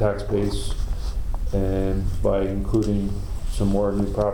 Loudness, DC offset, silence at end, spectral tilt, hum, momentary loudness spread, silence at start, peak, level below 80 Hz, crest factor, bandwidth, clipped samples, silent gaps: -25 LUFS; under 0.1%; 0 s; -7.5 dB/octave; none; 8 LU; 0 s; -8 dBFS; -26 dBFS; 14 dB; 17 kHz; under 0.1%; none